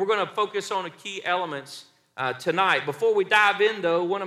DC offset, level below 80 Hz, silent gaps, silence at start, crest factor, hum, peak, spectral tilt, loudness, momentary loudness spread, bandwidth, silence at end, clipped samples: under 0.1%; -78 dBFS; none; 0 s; 18 dB; none; -6 dBFS; -3.5 dB/octave; -24 LUFS; 15 LU; 14 kHz; 0 s; under 0.1%